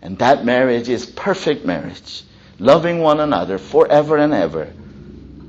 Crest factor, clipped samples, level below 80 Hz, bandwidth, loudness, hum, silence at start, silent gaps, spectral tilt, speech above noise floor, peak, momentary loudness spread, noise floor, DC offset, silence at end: 16 dB; under 0.1%; -48 dBFS; 8 kHz; -16 LUFS; none; 0 s; none; -6 dB/octave; 21 dB; 0 dBFS; 16 LU; -37 dBFS; under 0.1%; 0 s